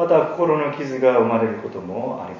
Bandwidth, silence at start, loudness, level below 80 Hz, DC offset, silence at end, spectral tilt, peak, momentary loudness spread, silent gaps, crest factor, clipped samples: 7.2 kHz; 0 s; -20 LUFS; -62 dBFS; under 0.1%; 0 s; -8 dB/octave; -4 dBFS; 11 LU; none; 16 dB; under 0.1%